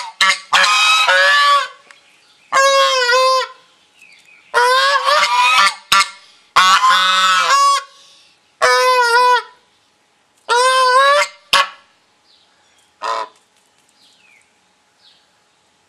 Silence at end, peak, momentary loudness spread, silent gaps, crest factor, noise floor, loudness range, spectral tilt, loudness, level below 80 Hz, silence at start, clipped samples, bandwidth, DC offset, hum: 2.65 s; 0 dBFS; 10 LU; none; 16 dB; -58 dBFS; 11 LU; 1.5 dB/octave; -12 LUFS; -64 dBFS; 0 s; under 0.1%; 15 kHz; under 0.1%; none